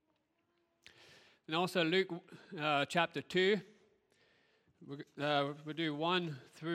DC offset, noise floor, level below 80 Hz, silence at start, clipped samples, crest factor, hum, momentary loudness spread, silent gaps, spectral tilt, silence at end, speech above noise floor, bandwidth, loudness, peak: under 0.1%; -80 dBFS; -84 dBFS; 1.5 s; under 0.1%; 22 dB; none; 16 LU; none; -5 dB/octave; 0 s; 44 dB; 14.5 kHz; -35 LUFS; -16 dBFS